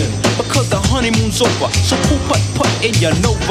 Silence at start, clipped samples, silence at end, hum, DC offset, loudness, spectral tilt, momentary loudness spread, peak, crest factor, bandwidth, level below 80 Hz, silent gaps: 0 s; under 0.1%; 0 s; none; under 0.1%; -14 LUFS; -4.5 dB/octave; 2 LU; -2 dBFS; 12 dB; 15.5 kHz; -26 dBFS; none